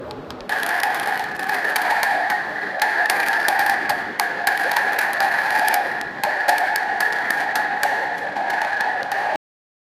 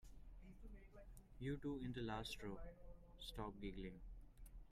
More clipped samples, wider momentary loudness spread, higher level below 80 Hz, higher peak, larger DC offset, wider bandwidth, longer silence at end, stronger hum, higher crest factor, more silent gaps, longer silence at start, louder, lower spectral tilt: neither; second, 6 LU vs 17 LU; about the same, -62 dBFS vs -60 dBFS; first, 0 dBFS vs -36 dBFS; neither; about the same, 16.5 kHz vs 15.5 kHz; first, 0.65 s vs 0 s; neither; first, 22 dB vs 16 dB; neither; about the same, 0 s vs 0 s; first, -20 LUFS vs -51 LUFS; second, -1 dB/octave vs -6 dB/octave